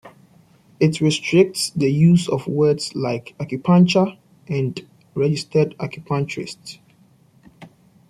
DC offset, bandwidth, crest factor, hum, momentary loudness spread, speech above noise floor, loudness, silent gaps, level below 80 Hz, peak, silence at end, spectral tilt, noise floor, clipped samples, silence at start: under 0.1%; 14 kHz; 18 dB; none; 15 LU; 36 dB; -19 LUFS; none; -58 dBFS; -2 dBFS; 0.45 s; -6 dB/octave; -54 dBFS; under 0.1%; 0.05 s